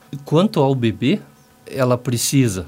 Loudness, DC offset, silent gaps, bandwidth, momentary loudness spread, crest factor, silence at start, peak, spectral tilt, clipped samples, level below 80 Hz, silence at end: -18 LUFS; under 0.1%; none; 16 kHz; 5 LU; 16 dB; 0.1 s; -2 dBFS; -5.5 dB/octave; under 0.1%; -56 dBFS; 0 s